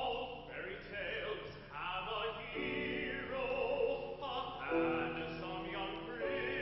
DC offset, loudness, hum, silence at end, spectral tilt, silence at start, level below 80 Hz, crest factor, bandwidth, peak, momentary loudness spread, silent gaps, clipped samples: under 0.1%; -40 LUFS; none; 0 s; -2.5 dB/octave; 0 s; -60 dBFS; 16 dB; 6 kHz; -24 dBFS; 8 LU; none; under 0.1%